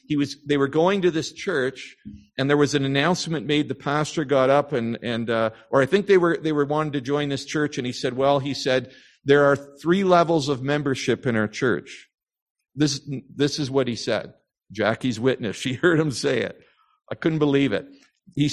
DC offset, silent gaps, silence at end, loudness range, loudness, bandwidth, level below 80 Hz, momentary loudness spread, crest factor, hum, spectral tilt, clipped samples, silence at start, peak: under 0.1%; 12.42-12.55 s; 0 s; 4 LU; -22 LUFS; 12 kHz; -58 dBFS; 9 LU; 20 dB; none; -5.5 dB/octave; under 0.1%; 0.1 s; -2 dBFS